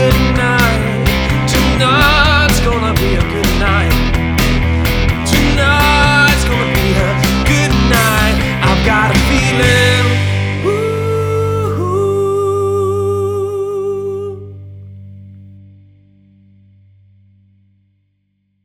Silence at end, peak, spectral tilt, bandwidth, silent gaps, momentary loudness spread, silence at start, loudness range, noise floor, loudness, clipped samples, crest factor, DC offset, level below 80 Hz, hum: 3.15 s; 0 dBFS; -5 dB/octave; over 20 kHz; none; 8 LU; 0 s; 9 LU; -63 dBFS; -12 LUFS; under 0.1%; 14 dB; under 0.1%; -20 dBFS; 50 Hz at -40 dBFS